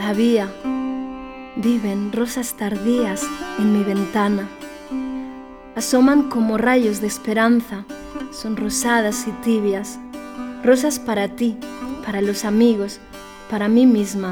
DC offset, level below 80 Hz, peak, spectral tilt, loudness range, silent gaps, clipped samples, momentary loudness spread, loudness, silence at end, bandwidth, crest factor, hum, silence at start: under 0.1%; -48 dBFS; -2 dBFS; -5 dB/octave; 3 LU; none; under 0.1%; 16 LU; -20 LUFS; 0 s; 18 kHz; 16 dB; none; 0 s